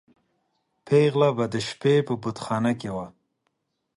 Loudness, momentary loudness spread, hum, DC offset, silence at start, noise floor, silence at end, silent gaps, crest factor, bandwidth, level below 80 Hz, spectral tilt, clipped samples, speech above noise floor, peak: -24 LUFS; 11 LU; none; under 0.1%; 0.85 s; -76 dBFS; 0.9 s; none; 18 dB; 11 kHz; -62 dBFS; -6.5 dB/octave; under 0.1%; 53 dB; -8 dBFS